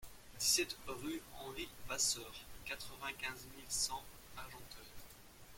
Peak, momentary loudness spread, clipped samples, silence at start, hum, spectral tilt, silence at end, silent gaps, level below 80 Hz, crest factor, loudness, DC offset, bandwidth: -20 dBFS; 20 LU; under 0.1%; 0 s; none; -0.5 dB/octave; 0 s; none; -62 dBFS; 24 dB; -39 LUFS; under 0.1%; 16.5 kHz